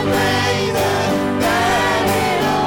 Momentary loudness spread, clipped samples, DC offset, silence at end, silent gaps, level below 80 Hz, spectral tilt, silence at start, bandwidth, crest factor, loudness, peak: 2 LU; under 0.1%; under 0.1%; 0 s; none; -42 dBFS; -4.5 dB/octave; 0 s; 17.5 kHz; 6 dB; -16 LUFS; -10 dBFS